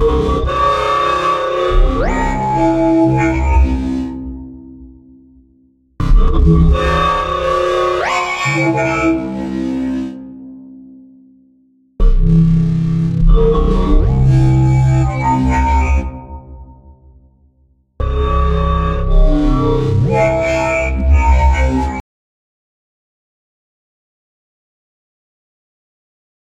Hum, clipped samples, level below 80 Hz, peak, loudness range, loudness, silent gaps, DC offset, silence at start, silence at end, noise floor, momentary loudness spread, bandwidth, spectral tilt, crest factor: none; under 0.1%; -18 dBFS; 0 dBFS; 6 LU; -14 LUFS; none; under 0.1%; 0 s; 4.5 s; -55 dBFS; 11 LU; 8.4 kHz; -7.5 dB/octave; 14 dB